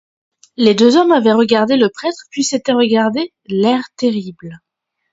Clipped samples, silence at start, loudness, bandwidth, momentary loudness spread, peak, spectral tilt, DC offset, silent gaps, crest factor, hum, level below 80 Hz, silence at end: under 0.1%; 0.6 s; -14 LUFS; 7.8 kHz; 12 LU; 0 dBFS; -4.5 dB/octave; under 0.1%; none; 14 dB; none; -60 dBFS; 0.55 s